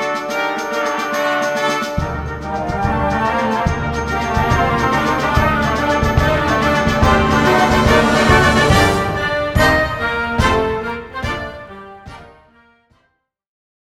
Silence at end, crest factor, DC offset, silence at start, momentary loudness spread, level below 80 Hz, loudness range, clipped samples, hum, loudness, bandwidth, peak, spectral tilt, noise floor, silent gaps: 1.6 s; 16 dB; under 0.1%; 0 s; 11 LU; -28 dBFS; 7 LU; under 0.1%; none; -16 LUFS; 16 kHz; 0 dBFS; -5 dB/octave; -66 dBFS; none